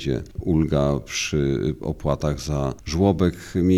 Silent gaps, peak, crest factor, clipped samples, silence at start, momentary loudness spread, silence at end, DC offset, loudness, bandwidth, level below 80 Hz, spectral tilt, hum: none; -6 dBFS; 16 dB; under 0.1%; 0 s; 7 LU; 0 s; under 0.1%; -23 LUFS; 14.5 kHz; -38 dBFS; -6 dB/octave; none